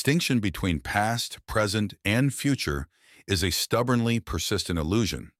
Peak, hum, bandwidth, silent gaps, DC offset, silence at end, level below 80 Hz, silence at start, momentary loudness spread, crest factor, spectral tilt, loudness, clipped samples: -8 dBFS; none; 16.5 kHz; none; under 0.1%; 0.15 s; -42 dBFS; 0 s; 5 LU; 18 dB; -4.5 dB/octave; -26 LUFS; under 0.1%